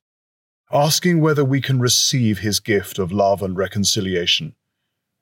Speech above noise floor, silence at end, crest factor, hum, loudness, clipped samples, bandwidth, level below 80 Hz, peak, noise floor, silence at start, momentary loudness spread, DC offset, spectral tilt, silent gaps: 59 dB; 0.7 s; 14 dB; none; -18 LUFS; under 0.1%; 17 kHz; -60 dBFS; -6 dBFS; -77 dBFS; 0.7 s; 7 LU; under 0.1%; -4 dB/octave; none